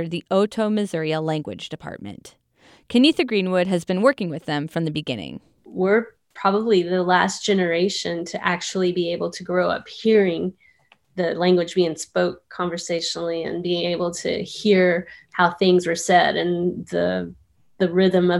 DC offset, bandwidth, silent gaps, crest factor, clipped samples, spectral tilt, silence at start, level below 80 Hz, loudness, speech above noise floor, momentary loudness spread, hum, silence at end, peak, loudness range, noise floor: under 0.1%; 12 kHz; none; 20 dB; under 0.1%; -5 dB/octave; 0 s; -62 dBFS; -21 LUFS; 37 dB; 11 LU; none; 0 s; -2 dBFS; 3 LU; -58 dBFS